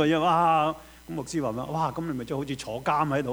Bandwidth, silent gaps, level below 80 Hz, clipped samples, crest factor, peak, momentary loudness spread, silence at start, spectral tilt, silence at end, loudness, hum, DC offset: over 20 kHz; none; -54 dBFS; under 0.1%; 16 dB; -10 dBFS; 12 LU; 0 s; -6 dB/octave; 0 s; -27 LUFS; none; under 0.1%